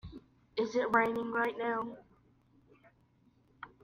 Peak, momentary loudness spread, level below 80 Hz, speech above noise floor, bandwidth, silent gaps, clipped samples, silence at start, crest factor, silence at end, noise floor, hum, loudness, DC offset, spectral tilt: -14 dBFS; 23 LU; -66 dBFS; 36 dB; 15 kHz; none; under 0.1%; 0.05 s; 24 dB; 0.15 s; -68 dBFS; none; -33 LUFS; under 0.1%; -5.5 dB/octave